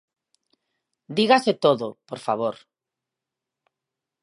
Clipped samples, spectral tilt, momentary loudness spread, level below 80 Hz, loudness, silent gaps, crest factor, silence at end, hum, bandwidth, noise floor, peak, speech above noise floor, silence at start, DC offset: under 0.1%; -5 dB/octave; 15 LU; -76 dBFS; -22 LUFS; none; 24 dB; 1.7 s; none; 11.5 kHz; -87 dBFS; -2 dBFS; 65 dB; 1.1 s; under 0.1%